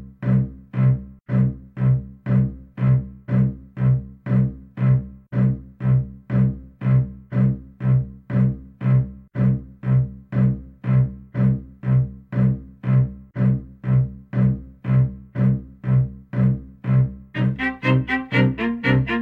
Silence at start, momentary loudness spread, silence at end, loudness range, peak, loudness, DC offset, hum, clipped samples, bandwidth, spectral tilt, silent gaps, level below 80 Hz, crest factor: 0 s; 6 LU; 0 s; 1 LU; -6 dBFS; -22 LUFS; under 0.1%; none; under 0.1%; 4.4 kHz; -10 dB/octave; none; -40 dBFS; 14 dB